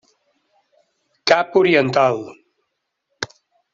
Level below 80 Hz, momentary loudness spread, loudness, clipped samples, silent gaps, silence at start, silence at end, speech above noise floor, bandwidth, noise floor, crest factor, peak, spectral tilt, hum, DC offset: -62 dBFS; 16 LU; -17 LUFS; under 0.1%; none; 1.25 s; 0.5 s; 59 dB; 7.6 kHz; -75 dBFS; 20 dB; -2 dBFS; -5 dB/octave; none; under 0.1%